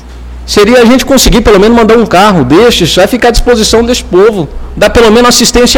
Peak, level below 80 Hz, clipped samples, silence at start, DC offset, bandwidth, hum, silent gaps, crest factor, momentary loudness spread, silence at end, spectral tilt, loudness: 0 dBFS; -18 dBFS; 9%; 0 s; under 0.1%; 19.5 kHz; none; none; 4 dB; 5 LU; 0 s; -4 dB/octave; -5 LUFS